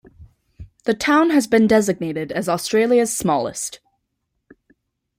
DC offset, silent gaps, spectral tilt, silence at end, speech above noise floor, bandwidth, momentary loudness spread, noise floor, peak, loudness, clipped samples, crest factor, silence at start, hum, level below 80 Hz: under 0.1%; none; -4.5 dB/octave; 1.4 s; 57 dB; 16 kHz; 11 LU; -74 dBFS; -2 dBFS; -19 LUFS; under 0.1%; 18 dB; 0.2 s; none; -54 dBFS